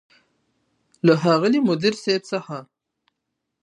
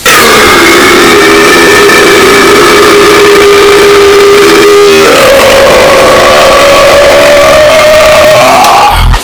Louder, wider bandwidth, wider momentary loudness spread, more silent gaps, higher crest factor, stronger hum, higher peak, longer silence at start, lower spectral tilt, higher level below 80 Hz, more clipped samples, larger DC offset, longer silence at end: second, -20 LUFS vs -1 LUFS; second, 11 kHz vs over 20 kHz; first, 13 LU vs 1 LU; neither; first, 20 dB vs 2 dB; neither; second, -4 dBFS vs 0 dBFS; first, 1.05 s vs 0 s; first, -6 dB/octave vs -3 dB/octave; second, -70 dBFS vs -20 dBFS; second, under 0.1% vs 70%; neither; first, 1 s vs 0 s